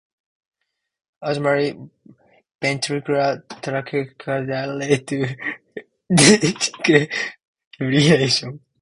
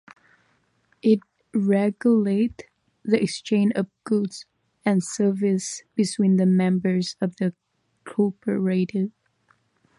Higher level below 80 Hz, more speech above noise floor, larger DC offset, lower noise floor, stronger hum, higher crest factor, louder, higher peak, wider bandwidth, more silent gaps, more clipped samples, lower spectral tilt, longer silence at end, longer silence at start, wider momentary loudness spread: first, -58 dBFS vs -66 dBFS; second, 32 dB vs 44 dB; neither; second, -51 dBFS vs -66 dBFS; neither; about the same, 22 dB vs 18 dB; first, -19 LUFS vs -23 LUFS; first, 0 dBFS vs -6 dBFS; about the same, 11.5 kHz vs 11.5 kHz; first, 2.55-2.59 s, 7.47-7.54 s, 7.66-7.71 s vs none; neither; second, -4 dB/octave vs -6.5 dB/octave; second, 0.25 s vs 0.9 s; first, 1.2 s vs 1.05 s; first, 15 LU vs 9 LU